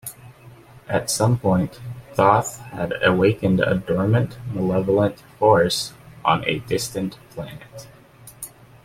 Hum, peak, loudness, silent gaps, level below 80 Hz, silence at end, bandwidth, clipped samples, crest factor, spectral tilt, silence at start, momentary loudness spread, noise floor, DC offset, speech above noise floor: none; -2 dBFS; -21 LUFS; none; -50 dBFS; 0.35 s; 16.5 kHz; under 0.1%; 20 dB; -5.5 dB/octave; 0.05 s; 19 LU; -45 dBFS; under 0.1%; 25 dB